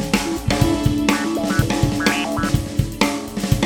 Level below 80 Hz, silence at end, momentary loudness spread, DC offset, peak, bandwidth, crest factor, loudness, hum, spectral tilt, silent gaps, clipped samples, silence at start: -32 dBFS; 0 s; 3 LU; under 0.1%; 0 dBFS; 19 kHz; 18 dB; -20 LUFS; none; -5 dB/octave; none; under 0.1%; 0 s